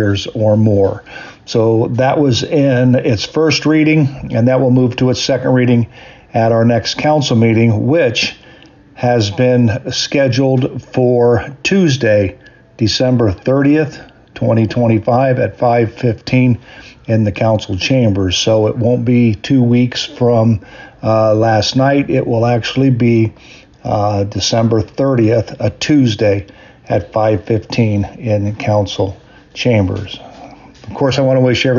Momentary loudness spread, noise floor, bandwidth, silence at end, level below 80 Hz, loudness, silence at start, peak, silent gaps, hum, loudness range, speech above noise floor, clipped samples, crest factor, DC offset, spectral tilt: 7 LU; -41 dBFS; 7.4 kHz; 0 s; -44 dBFS; -13 LUFS; 0 s; -2 dBFS; none; none; 3 LU; 29 dB; under 0.1%; 10 dB; under 0.1%; -6.5 dB/octave